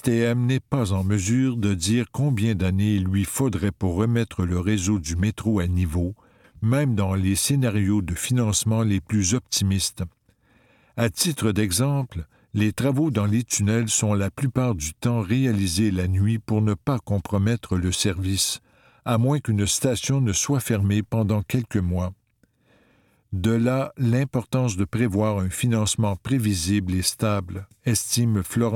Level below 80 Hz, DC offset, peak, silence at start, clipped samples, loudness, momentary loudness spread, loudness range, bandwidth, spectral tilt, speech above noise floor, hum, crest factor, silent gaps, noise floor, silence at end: -44 dBFS; under 0.1%; -6 dBFS; 0.05 s; under 0.1%; -23 LUFS; 4 LU; 2 LU; 17.5 kHz; -5 dB/octave; 42 dB; none; 18 dB; none; -65 dBFS; 0 s